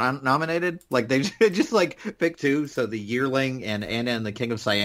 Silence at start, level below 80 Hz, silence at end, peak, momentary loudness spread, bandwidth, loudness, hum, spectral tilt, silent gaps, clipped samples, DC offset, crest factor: 0 s; -60 dBFS; 0 s; -6 dBFS; 6 LU; 16 kHz; -24 LUFS; none; -5 dB/octave; none; under 0.1%; under 0.1%; 18 dB